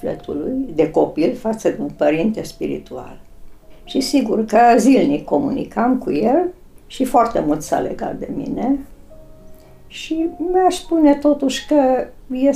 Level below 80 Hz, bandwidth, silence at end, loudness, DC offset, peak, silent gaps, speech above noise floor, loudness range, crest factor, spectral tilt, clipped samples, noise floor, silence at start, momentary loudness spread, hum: -42 dBFS; 15 kHz; 0 s; -18 LUFS; under 0.1%; -4 dBFS; none; 23 dB; 5 LU; 14 dB; -5.5 dB/octave; under 0.1%; -40 dBFS; 0 s; 12 LU; none